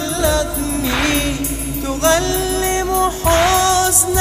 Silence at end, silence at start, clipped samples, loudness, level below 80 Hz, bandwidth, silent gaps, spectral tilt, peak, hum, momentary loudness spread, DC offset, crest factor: 0 s; 0 s; under 0.1%; -16 LUFS; -28 dBFS; 16 kHz; none; -3 dB/octave; 0 dBFS; none; 8 LU; under 0.1%; 16 dB